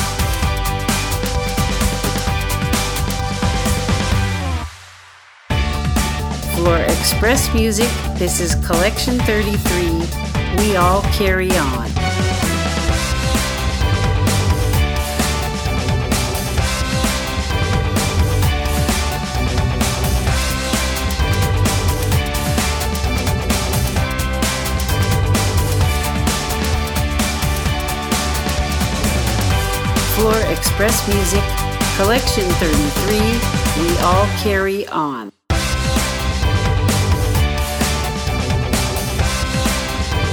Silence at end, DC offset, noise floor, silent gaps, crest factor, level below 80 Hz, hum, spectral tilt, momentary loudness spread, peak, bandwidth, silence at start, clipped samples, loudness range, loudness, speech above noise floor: 0 s; under 0.1%; -43 dBFS; none; 16 dB; -22 dBFS; none; -4.5 dB/octave; 5 LU; 0 dBFS; over 20 kHz; 0 s; under 0.1%; 3 LU; -17 LUFS; 28 dB